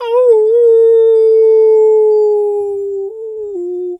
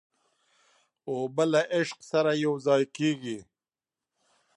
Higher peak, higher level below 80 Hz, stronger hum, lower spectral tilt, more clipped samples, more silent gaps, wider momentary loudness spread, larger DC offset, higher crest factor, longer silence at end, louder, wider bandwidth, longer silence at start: first, 0 dBFS vs -10 dBFS; first, -64 dBFS vs -78 dBFS; neither; about the same, -5 dB/octave vs -5.5 dB/octave; neither; neither; about the same, 14 LU vs 12 LU; neither; second, 10 dB vs 18 dB; second, 0.05 s vs 1.15 s; first, -10 LUFS vs -27 LUFS; second, 3.8 kHz vs 11.5 kHz; second, 0 s vs 1.05 s